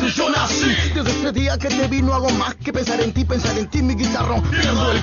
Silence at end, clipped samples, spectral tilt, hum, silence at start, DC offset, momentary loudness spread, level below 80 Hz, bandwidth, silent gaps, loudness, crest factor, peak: 0 s; under 0.1%; -4.5 dB/octave; none; 0 s; under 0.1%; 4 LU; -28 dBFS; 7.2 kHz; none; -19 LUFS; 14 dB; -4 dBFS